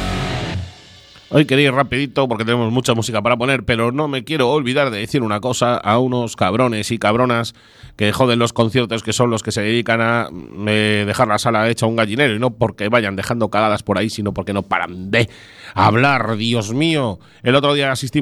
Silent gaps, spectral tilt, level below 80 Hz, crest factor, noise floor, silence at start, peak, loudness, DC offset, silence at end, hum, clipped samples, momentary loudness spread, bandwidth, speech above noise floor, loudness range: none; -5 dB/octave; -44 dBFS; 16 dB; -43 dBFS; 0 s; 0 dBFS; -17 LUFS; under 0.1%; 0 s; none; under 0.1%; 6 LU; 13.5 kHz; 26 dB; 1 LU